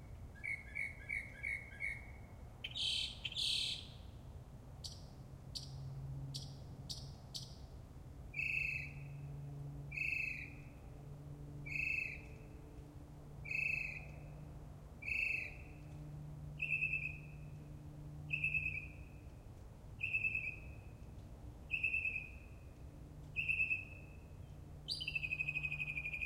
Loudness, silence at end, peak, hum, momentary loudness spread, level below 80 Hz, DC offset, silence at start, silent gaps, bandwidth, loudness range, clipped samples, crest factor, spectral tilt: -41 LUFS; 0 s; -26 dBFS; none; 19 LU; -58 dBFS; under 0.1%; 0 s; none; 16 kHz; 5 LU; under 0.1%; 18 dB; -3 dB/octave